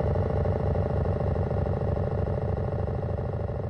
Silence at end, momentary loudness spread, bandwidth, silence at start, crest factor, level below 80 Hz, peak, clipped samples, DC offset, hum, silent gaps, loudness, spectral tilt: 0 s; 4 LU; 5.6 kHz; 0 s; 12 dB; -34 dBFS; -14 dBFS; under 0.1%; under 0.1%; none; none; -28 LUFS; -10.5 dB/octave